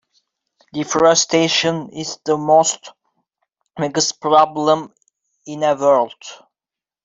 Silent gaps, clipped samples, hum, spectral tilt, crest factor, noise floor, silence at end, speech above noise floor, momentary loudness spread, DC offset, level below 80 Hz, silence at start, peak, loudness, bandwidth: none; under 0.1%; none; -3 dB/octave; 18 dB; -89 dBFS; 0.7 s; 73 dB; 16 LU; under 0.1%; -64 dBFS; 0.75 s; -2 dBFS; -17 LUFS; 8 kHz